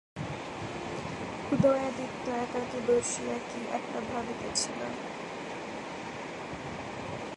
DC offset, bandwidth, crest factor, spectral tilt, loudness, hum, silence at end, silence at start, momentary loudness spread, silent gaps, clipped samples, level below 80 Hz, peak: under 0.1%; 11.5 kHz; 20 dB; -4 dB/octave; -33 LUFS; none; 0 s; 0.15 s; 12 LU; none; under 0.1%; -58 dBFS; -12 dBFS